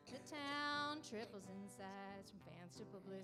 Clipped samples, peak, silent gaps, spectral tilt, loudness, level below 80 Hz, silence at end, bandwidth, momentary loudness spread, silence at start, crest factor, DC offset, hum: under 0.1%; -32 dBFS; none; -4 dB/octave; -49 LUFS; -82 dBFS; 0 s; 15.5 kHz; 15 LU; 0 s; 18 dB; under 0.1%; none